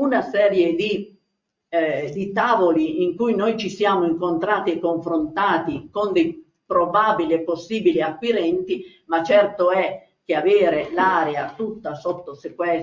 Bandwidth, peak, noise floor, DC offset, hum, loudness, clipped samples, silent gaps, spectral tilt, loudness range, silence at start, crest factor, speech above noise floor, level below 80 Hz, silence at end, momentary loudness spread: 7.6 kHz; -4 dBFS; -76 dBFS; under 0.1%; none; -21 LUFS; under 0.1%; none; -6 dB/octave; 2 LU; 0 s; 16 dB; 56 dB; -60 dBFS; 0 s; 11 LU